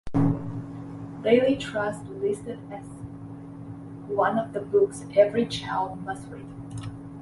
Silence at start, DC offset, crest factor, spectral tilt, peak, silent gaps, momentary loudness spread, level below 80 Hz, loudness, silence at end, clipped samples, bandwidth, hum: 0.05 s; under 0.1%; 20 dB; -6.5 dB/octave; -6 dBFS; none; 19 LU; -52 dBFS; -26 LUFS; 0 s; under 0.1%; 11.5 kHz; none